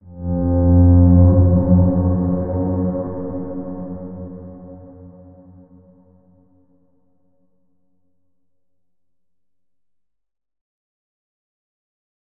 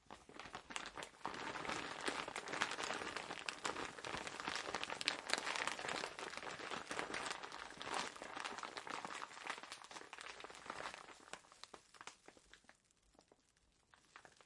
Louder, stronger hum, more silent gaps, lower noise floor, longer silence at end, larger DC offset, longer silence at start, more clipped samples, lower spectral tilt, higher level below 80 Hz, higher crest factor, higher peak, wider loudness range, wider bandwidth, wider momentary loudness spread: first, -16 LUFS vs -45 LUFS; neither; neither; first, -85 dBFS vs -76 dBFS; first, 7.15 s vs 0 s; neither; about the same, 0.05 s vs 0.05 s; neither; first, -16.5 dB/octave vs -1.5 dB/octave; first, -38 dBFS vs -76 dBFS; second, 18 dB vs 34 dB; first, -2 dBFS vs -14 dBFS; first, 22 LU vs 12 LU; second, 1.8 kHz vs 11.5 kHz; first, 22 LU vs 16 LU